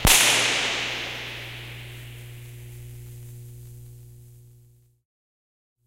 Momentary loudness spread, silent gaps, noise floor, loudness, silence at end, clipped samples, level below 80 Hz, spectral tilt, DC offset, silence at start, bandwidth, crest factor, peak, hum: 26 LU; none; -56 dBFS; -21 LUFS; 1.5 s; under 0.1%; -40 dBFS; -1 dB/octave; under 0.1%; 0 s; 16 kHz; 26 dB; -2 dBFS; 60 Hz at -40 dBFS